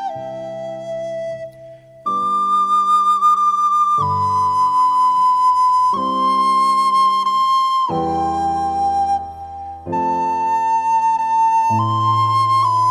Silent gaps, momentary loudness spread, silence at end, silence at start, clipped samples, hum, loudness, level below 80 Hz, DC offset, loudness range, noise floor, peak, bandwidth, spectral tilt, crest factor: none; 14 LU; 0 s; 0 s; under 0.1%; none; -16 LUFS; -52 dBFS; under 0.1%; 4 LU; -40 dBFS; -6 dBFS; 13 kHz; -5 dB/octave; 10 dB